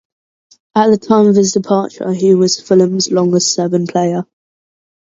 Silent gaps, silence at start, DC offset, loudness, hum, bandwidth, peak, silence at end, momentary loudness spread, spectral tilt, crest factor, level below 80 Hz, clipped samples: none; 0.75 s; under 0.1%; -13 LUFS; none; 8 kHz; 0 dBFS; 0.9 s; 8 LU; -5 dB/octave; 14 dB; -60 dBFS; under 0.1%